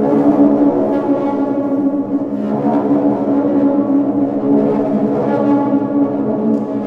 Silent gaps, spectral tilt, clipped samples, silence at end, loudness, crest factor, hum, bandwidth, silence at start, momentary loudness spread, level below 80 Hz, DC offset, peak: none; -10 dB/octave; under 0.1%; 0 s; -15 LUFS; 14 dB; none; 3.8 kHz; 0 s; 5 LU; -54 dBFS; under 0.1%; 0 dBFS